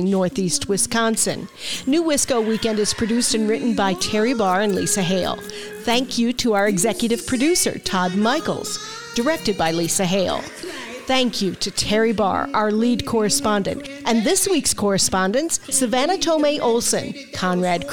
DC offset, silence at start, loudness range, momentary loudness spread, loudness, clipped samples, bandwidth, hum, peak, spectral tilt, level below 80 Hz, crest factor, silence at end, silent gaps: 1%; 0 s; 2 LU; 8 LU; -20 LUFS; under 0.1%; 19 kHz; none; -4 dBFS; -3.5 dB/octave; -48 dBFS; 16 dB; 0 s; none